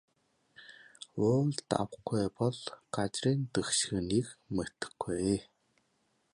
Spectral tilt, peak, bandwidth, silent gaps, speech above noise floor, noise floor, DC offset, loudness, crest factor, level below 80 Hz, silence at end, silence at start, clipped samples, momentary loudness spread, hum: -5 dB/octave; -12 dBFS; 11.5 kHz; none; 43 dB; -75 dBFS; under 0.1%; -33 LUFS; 22 dB; -60 dBFS; 0.9 s; 0.6 s; under 0.1%; 13 LU; none